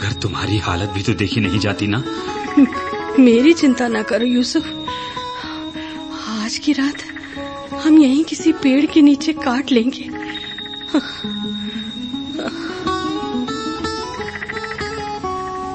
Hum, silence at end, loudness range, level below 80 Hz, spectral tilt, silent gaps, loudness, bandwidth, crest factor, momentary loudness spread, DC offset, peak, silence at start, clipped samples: none; 0 s; 8 LU; -46 dBFS; -5.5 dB/octave; none; -18 LUFS; 8.8 kHz; 16 dB; 14 LU; under 0.1%; -2 dBFS; 0 s; under 0.1%